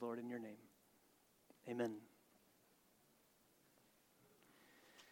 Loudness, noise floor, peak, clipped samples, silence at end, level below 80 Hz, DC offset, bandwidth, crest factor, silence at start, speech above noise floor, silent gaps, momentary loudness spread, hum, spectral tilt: -48 LUFS; -75 dBFS; -30 dBFS; under 0.1%; 0 s; under -90 dBFS; under 0.1%; 19 kHz; 24 dB; 0 s; 28 dB; none; 23 LU; none; -6 dB/octave